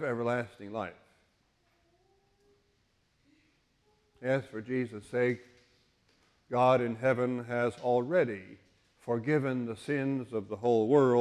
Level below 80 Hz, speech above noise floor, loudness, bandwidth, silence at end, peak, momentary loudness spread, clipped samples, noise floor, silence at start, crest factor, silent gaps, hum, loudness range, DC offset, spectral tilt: -70 dBFS; 43 dB; -31 LUFS; 11.5 kHz; 0 s; -12 dBFS; 13 LU; under 0.1%; -72 dBFS; 0 s; 20 dB; none; none; 11 LU; under 0.1%; -7.5 dB/octave